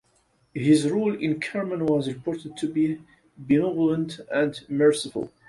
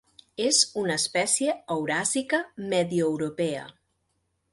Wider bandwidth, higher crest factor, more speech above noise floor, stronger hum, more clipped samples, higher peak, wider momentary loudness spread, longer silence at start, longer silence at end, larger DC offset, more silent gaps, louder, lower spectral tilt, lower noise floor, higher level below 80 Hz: about the same, 11.5 kHz vs 11.5 kHz; about the same, 18 dB vs 20 dB; second, 41 dB vs 48 dB; neither; neither; about the same, -8 dBFS vs -6 dBFS; about the same, 10 LU vs 8 LU; first, 0.55 s vs 0.4 s; second, 0.2 s vs 0.8 s; neither; neither; about the same, -24 LUFS vs -25 LUFS; first, -6 dB/octave vs -2.5 dB/octave; second, -65 dBFS vs -75 dBFS; first, -62 dBFS vs -68 dBFS